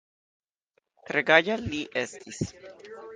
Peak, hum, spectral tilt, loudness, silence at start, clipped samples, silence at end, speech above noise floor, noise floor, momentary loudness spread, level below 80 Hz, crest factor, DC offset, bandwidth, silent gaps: -4 dBFS; none; -4 dB/octave; -26 LUFS; 1.1 s; under 0.1%; 0 s; 47 dB; -74 dBFS; 17 LU; -56 dBFS; 26 dB; under 0.1%; 9.8 kHz; none